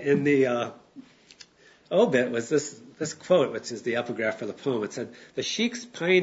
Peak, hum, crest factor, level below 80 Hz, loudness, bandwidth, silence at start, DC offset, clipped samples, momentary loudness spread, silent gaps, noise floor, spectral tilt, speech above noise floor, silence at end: -8 dBFS; none; 18 dB; -74 dBFS; -27 LUFS; 8 kHz; 0 s; under 0.1%; under 0.1%; 12 LU; none; -54 dBFS; -4.5 dB/octave; 28 dB; 0 s